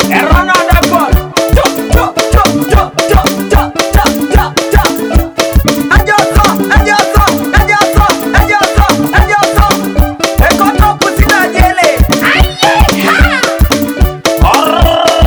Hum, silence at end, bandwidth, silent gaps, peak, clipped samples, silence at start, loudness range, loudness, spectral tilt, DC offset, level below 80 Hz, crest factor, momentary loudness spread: none; 0 s; over 20 kHz; none; 0 dBFS; 3%; 0 s; 2 LU; -8 LUFS; -4.5 dB/octave; under 0.1%; -12 dBFS; 8 dB; 3 LU